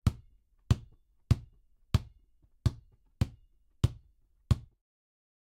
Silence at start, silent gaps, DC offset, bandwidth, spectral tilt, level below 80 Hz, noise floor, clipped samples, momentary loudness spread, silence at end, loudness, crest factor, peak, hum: 0.05 s; none; under 0.1%; 15.5 kHz; -7 dB/octave; -42 dBFS; -66 dBFS; under 0.1%; 18 LU; 0.8 s; -34 LUFS; 24 dB; -10 dBFS; none